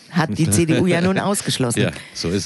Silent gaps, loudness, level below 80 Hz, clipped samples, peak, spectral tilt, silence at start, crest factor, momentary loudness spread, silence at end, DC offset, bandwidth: none; -19 LUFS; -48 dBFS; under 0.1%; -4 dBFS; -5 dB/octave; 0.1 s; 16 dB; 7 LU; 0 s; under 0.1%; 12 kHz